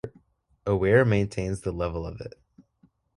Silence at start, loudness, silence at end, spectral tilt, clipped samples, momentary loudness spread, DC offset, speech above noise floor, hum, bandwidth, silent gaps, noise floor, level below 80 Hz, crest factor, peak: 0.05 s; -25 LUFS; 0.85 s; -7.5 dB/octave; under 0.1%; 21 LU; under 0.1%; 40 dB; none; 11.5 kHz; none; -65 dBFS; -44 dBFS; 22 dB; -6 dBFS